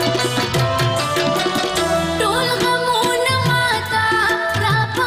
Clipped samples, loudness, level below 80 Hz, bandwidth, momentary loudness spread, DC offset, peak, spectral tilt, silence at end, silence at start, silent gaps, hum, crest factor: under 0.1%; -17 LUFS; -42 dBFS; 15.5 kHz; 2 LU; under 0.1%; -6 dBFS; -4 dB/octave; 0 s; 0 s; none; none; 10 dB